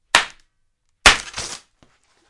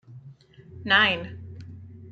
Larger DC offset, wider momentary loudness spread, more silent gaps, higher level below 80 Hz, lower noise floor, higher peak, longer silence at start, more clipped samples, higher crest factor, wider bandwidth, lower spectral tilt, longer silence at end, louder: neither; second, 18 LU vs 25 LU; neither; first, -38 dBFS vs -64 dBFS; first, -67 dBFS vs -49 dBFS; first, 0 dBFS vs -4 dBFS; about the same, 0.15 s vs 0.1 s; first, 0.1% vs under 0.1%; about the same, 22 dB vs 24 dB; first, 12 kHz vs 7.8 kHz; second, 0 dB/octave vs -5 dB/octave; first, 0.75 s vs 0 s; first, -16 LUFS vs -21 LUFS